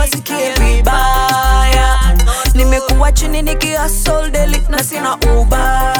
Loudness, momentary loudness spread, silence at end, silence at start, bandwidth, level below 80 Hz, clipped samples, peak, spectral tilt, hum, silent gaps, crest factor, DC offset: -13 LUFS; 4 LU; 0 s; 0 s; 19.5 kHz; -12 dBFS; under 0.1%; 0 dBFS; -4 dB/octave; none; none; 10 dB; under 0.1%